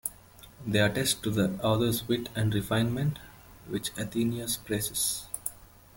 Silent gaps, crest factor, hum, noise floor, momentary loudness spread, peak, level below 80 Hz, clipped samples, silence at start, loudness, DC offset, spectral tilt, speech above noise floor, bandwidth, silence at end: none; 20 dB; none; -52 dBFS; 10 LU; -10 dBFS; -54 dBFS; under 0.1%; 0.05 s; -29 LUFS; under 0.1%; -4.5 dB/octave; 24 dB; 17 kHz; 0.3 s